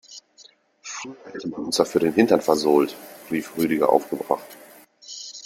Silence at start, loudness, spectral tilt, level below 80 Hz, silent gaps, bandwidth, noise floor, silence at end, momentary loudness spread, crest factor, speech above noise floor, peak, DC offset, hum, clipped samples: 0.1 s; -22 LUFS; -4.5 dB/octave; -64 dBFS; none; 16.5 kHz; -53 dBFS; 0 s; 21 LU; 22 dB; 32 dB; -2 dBFS; under 0.1%; none; under 0.1%